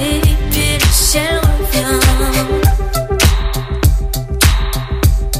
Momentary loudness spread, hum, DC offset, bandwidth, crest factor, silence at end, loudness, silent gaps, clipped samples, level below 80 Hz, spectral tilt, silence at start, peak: 7 LU; none; under 0.1%; 16.5 kHz; 12 dB; 0 s; -14 LUFS; none; under 0.1%; -16 dBFS; -4 dB/octave; 0 s; 0 dBFS